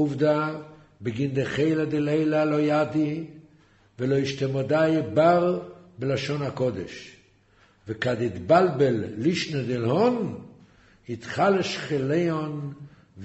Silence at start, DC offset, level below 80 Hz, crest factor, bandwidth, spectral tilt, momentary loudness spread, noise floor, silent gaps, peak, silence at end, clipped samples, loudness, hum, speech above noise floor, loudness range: 0 s; under 0.1%; -60 dBFS; 18 dB; 8.2 kHz; -7 dB/octave; 15 LU; -60 dBFS; none; -6 dBFS; 0 s; under 0.1%; -25 LUFS; none; 36 dB; 2 LU